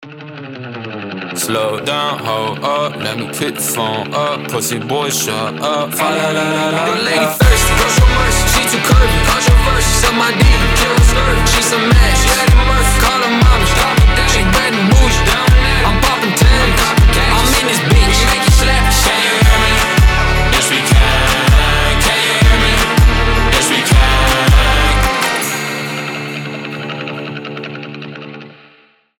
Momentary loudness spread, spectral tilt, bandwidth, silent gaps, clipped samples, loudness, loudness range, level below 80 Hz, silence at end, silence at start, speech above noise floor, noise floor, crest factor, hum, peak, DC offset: 12 LU; -4 dB/octave; 18.5 kHz; none; under 0.1%; -12 LUFS; 7 LU; -16 dBFS; 0.7 s; 0 s; 37 dB; -49 dBFS; 12 dB; none; 0 dBFS; under 0.1%